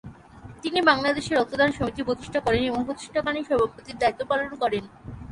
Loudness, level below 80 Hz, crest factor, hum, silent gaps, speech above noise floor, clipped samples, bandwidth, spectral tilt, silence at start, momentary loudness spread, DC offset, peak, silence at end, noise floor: -25 LUFS; -48 dBFS; 20 dB; none; none; 21 dB; under 0.1%; 11.5 kHz; -5 dB/octave; 0.05 s; 9 LU; under 0.1%; -6 dBFS; 0 s; -45 dBFS